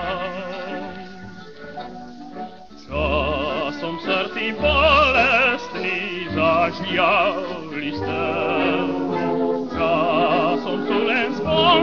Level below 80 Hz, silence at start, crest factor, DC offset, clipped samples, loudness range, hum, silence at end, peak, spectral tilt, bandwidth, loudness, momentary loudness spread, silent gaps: -40 dBFS; 0 s; 18 dB; 0.6%; under 0.1%; 9 LU; none; 0 s; -4 dBFS; -6 dB/octave; 7.2 kHz; -20 LUFS; 20 LU; none